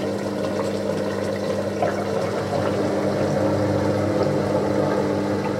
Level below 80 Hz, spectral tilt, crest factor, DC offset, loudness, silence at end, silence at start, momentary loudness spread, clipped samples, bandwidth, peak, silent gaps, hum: -52 dBFS; -6.5 dB/octave; 14 dB; under 0.1%; -23 LUFS; 0 s; 0 s; 4 LU; under 0.1%; 16 kHz; -8 dBFS; none; none